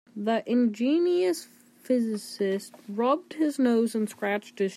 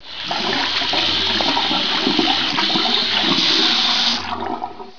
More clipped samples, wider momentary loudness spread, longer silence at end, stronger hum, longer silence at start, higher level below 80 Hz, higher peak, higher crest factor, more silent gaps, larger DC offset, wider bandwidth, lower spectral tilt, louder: neither; about the same, 7 LU vs 9 LU; about the same, 0 s vs 0 s; neither; first, 0.15 s vs 0 s; second, -82 dBFS vs -50 dBFS; second, -12 dBFS vs -2 dBFS; about the same, 14 dB vs 16 dB; neither; second, under 0.1% vs 2%; first, 15 kHz vs 5.4 kHz; first, -5.5 dB/octave vs -2.5 dB/octave; second, -27 LUFS vs -16 LUFS